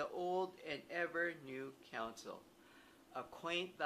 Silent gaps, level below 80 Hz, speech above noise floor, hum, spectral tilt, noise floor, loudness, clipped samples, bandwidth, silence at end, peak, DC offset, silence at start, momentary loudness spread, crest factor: none; -80 dBFS; 20 dB; none; -4 dB/octave; -65 dBFS; -44 LUFS; under 0.1%; 15 kHz; 0 s; -24 dBFS; under 0.1%; 0 s; 20 LU; 22 dB